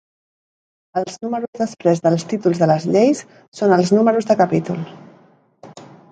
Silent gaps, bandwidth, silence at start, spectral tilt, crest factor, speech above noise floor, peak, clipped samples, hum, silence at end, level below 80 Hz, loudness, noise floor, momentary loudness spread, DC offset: 1.48-1.53 s, 3.48-3.52 s; 9.2 kHz; 0.95 s; -6.5 dB/octave; 18 dB; 35 dB; -2 dBFS; under 0.1%; none; 0.25 s; -64 dBFS; -18 LUFS; -52 dBFS; 10 LU; under 0.1%